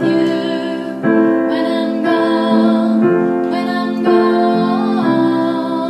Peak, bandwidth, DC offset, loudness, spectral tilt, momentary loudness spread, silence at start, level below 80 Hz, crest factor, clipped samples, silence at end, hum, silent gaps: 0 dBFS; 9.4 kHz; under 0.1%; -15 LUFS; -7.5 dB/octave; 5 LU; 0 s; -68 dBFS; 14 dB; under 0.1%; 0 s; none; none